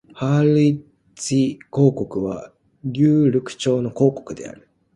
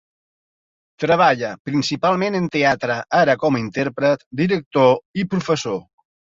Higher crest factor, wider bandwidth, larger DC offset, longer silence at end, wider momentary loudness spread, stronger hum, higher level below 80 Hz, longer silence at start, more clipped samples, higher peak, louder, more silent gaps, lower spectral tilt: about the same, 16 dB vs 18 dB; first, 11.5 kHz vs 7.8 kHz; neither; about the same, 0.45 s vs 0.5 s; first, 16 LU vs 7 LU; neither; about the same, -56 dBFS vs -58 dBFS; second, 0.15 s vs 1 s; neither; about the same, -4 dBFS vs -2 dBFS; about the same, -19 LUFS vs -19 LUFS; second, none vs 1.60-1.65 s, 4.26-4.31 s, 4.66-4.71 s, 5.05-5.14 s; first, -7 dB/octave vs -5.5 dB/octave